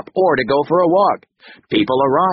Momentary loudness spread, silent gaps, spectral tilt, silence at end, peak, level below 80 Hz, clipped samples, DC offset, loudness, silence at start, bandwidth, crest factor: 6 LU; none; -4 dB/octave; 0 s; -2 dBFS; -52 dBFS; under 0.1%; under 0.1%; -16 LUFS; 0.15 s; 5.8 kHz; 14 dB